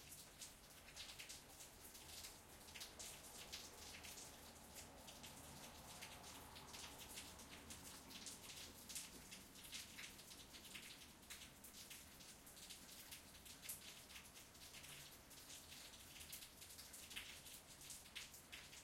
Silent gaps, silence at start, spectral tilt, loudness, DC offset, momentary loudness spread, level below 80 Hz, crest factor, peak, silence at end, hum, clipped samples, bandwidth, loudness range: none; 0 s; -1.5 dB/octave; -56 LUFS; under 0.1%; 5 LU; -74 dBFS; 24 dB; -34 dBFS; 0 s; none; under 0.1%; 16.5 kHz; 2 LU